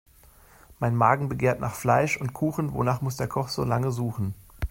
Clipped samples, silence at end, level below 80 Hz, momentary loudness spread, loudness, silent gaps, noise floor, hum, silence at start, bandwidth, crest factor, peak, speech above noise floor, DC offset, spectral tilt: under 0.1%; 0.05 s; -46 dBFS; 8 LU; -26 LUFS; none; -54 dBFS; none; 0.7 s; 16.5 kHz; 22 dB; -4 dBFS; 29 dB; under 0.1%; -6.5 dB/octave